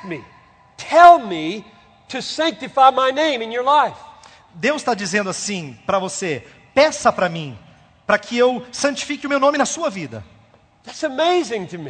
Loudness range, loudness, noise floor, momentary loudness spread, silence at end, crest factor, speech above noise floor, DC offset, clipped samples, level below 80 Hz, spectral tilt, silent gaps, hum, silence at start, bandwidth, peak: 5 LU; -18 LUFS; -52 dBFS; 17 LU; 0 s; 18 dB; 34 dB; under 0.1%; under 0.1%; -58 dBFS; -3.5 dB/octave; none; none; 0 s; 9.4 kHz; 0 dBFS